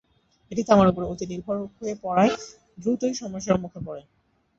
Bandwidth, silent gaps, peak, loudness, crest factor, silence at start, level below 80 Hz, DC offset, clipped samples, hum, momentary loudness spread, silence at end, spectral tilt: 7.8 kHz; none; -4 dBFS; -24 LUFS; 22 dB; 0.5 s; -52 dBFS; under 0.1%; under 0.1%; none; 18 LU; 0.55 s; -6 dB/octave